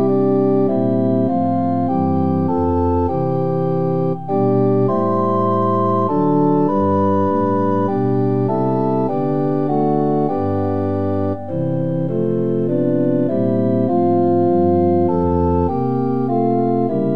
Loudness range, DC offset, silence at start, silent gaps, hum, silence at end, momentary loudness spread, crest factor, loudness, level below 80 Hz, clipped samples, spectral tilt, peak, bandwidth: 3 LU; 2%; 0 s; none; none; 0 s; 4 LU; 12 dB; -17 LUFS; -44 dBFS; under 0.1%; -11.5 dB/octave; -4 dBFS; 5 kHz